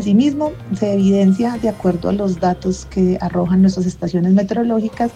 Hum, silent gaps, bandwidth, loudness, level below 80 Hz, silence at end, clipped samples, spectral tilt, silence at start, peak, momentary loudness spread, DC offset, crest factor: none; none; 8.4 kHz; -17 LUFS; -40 dBFS; 0.05 s; under 0.1%; -8 dB/octave; 0 s; -4 dBFS; 7 LU; under 0.1%; 12 dB